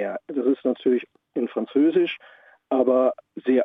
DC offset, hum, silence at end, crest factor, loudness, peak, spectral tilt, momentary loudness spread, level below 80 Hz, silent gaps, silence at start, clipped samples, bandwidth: under 0.1%; none; 0 s; 16 dB; -23 LUFS; -6 dBFS; -8 dB/octave; 10 LU; -78 dBFS; none; 0 s; under 0.1%; 3.9 kHz